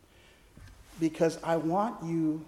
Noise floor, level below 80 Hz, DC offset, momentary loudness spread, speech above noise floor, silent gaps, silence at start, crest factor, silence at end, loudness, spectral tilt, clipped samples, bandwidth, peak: -59 dBFS; -60 dBFS; under 0.1%; 5 LU; 29 dB; none; 0.55 s; 16 dB; 0 s; -30 LUFS; -7 dB/octave; under 0.1%; 14 kHz; -16 dBFS